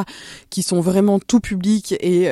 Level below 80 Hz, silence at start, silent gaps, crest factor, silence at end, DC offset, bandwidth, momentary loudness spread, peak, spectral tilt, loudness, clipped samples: -46 dBFS; 0 s; none; 16 dB; 0 s; under 0.1%; 14.5 kHz; 12 LU; -2 dBFS; -5.5 dB/octave; -18 LUFS; under 0.1%